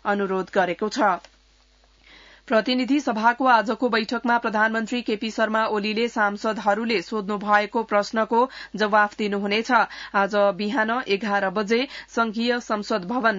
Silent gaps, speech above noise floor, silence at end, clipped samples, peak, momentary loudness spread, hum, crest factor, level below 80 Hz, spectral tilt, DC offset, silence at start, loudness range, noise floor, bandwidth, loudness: none; 35 dB; 0 s; under 0.1%; -6 dBFS; 6 LU; none; 18 dB; -62 dBFS; -4.5 dB/octave; under 0.1%; 0.05 s; 2 LU; -58 dBFS; 7.8 kHz; -22 LUFS